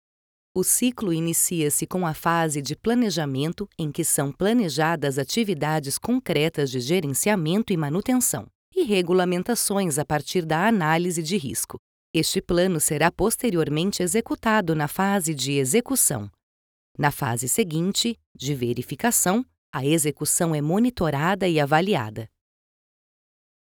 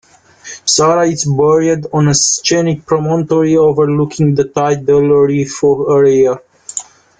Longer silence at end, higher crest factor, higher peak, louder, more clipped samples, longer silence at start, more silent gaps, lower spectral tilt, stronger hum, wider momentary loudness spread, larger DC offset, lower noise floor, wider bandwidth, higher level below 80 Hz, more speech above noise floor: first, 1.5 s vs 0.35 s; first, 18 dB vs 12 dB; second, -4 dBFS vs 0 dBFS; second, -23 LUFS vs -12 LUFS; neither; about the same, 0.55 s vs 0.45 s; first, 8.55-8.72 s, 11.79-12.14 s, 16.43-16.95 s, 18.26-18.35 s, 19.58-19.73 s vs none; about the same, -4 dB/octave vs -5 dB/octave; neither; about the same, 7 LU vs 7 LU; neither; first, under -90 dBFS vs -35 dBFS; first, over 20 kHz vs 9.6 kHz; about the same, -52 dBFS vs -48 dBFS; first, over 67 dB vs 24 dB